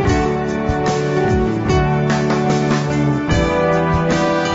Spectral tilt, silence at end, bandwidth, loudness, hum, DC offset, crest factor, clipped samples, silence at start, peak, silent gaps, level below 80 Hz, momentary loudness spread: -6.5 dB/octave; 0 s; 8 kHz; -17 LUFS; none; under 0.1%; 10 dB; under 0.1%; 0 s; -6 dBFS; none; -30 dBFS; 2 LU